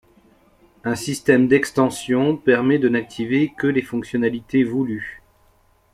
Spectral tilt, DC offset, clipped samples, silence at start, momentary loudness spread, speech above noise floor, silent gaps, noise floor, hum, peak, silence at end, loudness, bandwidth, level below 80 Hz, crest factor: -6 dB/octave; under 0.1%; under 0.1%; 0.85 s; 9 LU; 39 dB; none; -58 dBFS; none; -2 dBFS; 0.75 s; -20 LUFS; 14.5 kHz; -56 dBFS; 18 dB